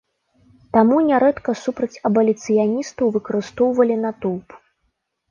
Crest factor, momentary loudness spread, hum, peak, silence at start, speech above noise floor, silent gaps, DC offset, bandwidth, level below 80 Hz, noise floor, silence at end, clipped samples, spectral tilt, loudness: 16 dB; 10 LU; none; -4 dBFS; 0.75 s; 53 dB; none; under 0.1%; 7.4 kHz; -58 dBFS; -71 dBFS; 0.75 s; under 0.1%; -6.5 dB/octave; -19 LUFS